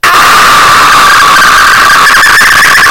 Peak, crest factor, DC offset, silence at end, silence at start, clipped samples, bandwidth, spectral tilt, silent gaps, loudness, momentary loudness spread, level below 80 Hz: 0 dBFS; 2 dB; 6%; 0 s; 0 s; 3%; over 20 kHz; -0.5 dB/octave; none; -1 LUFS; 0 LU; -30 dBFS